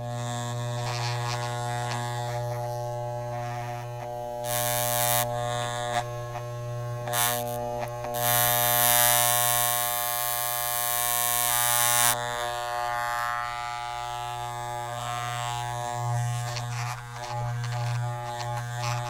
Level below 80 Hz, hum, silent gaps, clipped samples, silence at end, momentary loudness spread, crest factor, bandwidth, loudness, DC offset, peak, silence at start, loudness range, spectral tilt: -54 dBFS; none; none; under 0.1%; 0 s; 13 LU; 24 dB; 17.5 kHz; -26 LUFS; under 0.1%; -4 dBFS; 0 s; 9 LU; -2.5 dB/octave